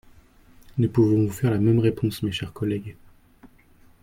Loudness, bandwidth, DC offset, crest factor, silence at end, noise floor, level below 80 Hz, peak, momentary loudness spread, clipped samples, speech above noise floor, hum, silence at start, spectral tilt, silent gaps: -23 LUFS; 16.5 kHz; under 0.1%; 18 dB; 0.55 s; -54 dBFS; -52 dBFS; -8 dBFS; 11 LU; under 0.1%; 32 dB; none; 0.75 s; -7.5 dB/octave; none